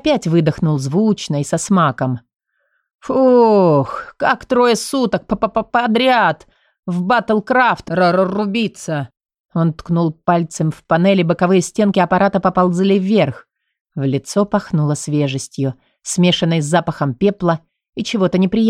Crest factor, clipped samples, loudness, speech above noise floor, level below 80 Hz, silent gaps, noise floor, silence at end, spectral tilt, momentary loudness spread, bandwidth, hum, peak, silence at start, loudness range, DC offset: 12 dB; under 0.1%; -16 LUFS; 52 dB; -50 dBFS; 2.95-2.99 s, 6.79-6.83 s, 9.40-9.49 s, 13.81-13.85 s, 17.89-17.93 s; -67 dBFS; 0 s; -6 dB/octave; 10 LU; 14 kHz; none; -2 dBFS; 0.05 s; 3 LU; under 0.1%